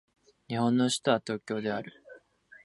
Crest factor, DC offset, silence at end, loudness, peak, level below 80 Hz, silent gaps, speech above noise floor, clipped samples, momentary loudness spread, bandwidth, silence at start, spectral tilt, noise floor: 20 dB; under 0.1%; 0.5 s; -29 LUFS; -10 dBFS; -72 dBFS; none; 28 dB; under 0.1%; 11 LU; 11.5 kHz; 0.5 s; -5 dB/octave; -57 dBFS